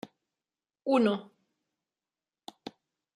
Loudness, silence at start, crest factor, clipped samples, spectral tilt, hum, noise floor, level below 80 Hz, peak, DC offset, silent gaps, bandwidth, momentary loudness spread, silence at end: -29 LUFS; 0.05 s; 20 dB; under 0.1%; -6.5 dB/octave; none; under -90 dBFS; -84 dBFS; -14 dBFS; under 0.1%; none; 11 kHz; 24 LU; 0.45 s